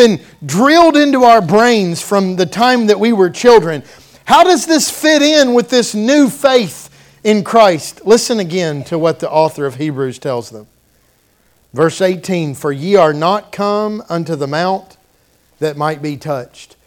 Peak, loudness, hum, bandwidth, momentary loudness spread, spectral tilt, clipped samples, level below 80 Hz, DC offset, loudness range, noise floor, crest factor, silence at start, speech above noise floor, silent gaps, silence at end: 0 dBFS; -12 LUFS; none; 18 kHz; 13 LU; -4.5 dB/octave; 0.4%; -52 dBFS; under 0.1%; 8 LU; -54 dBFS; 12 dB; 0 s; 42 dB; none; 0.25 s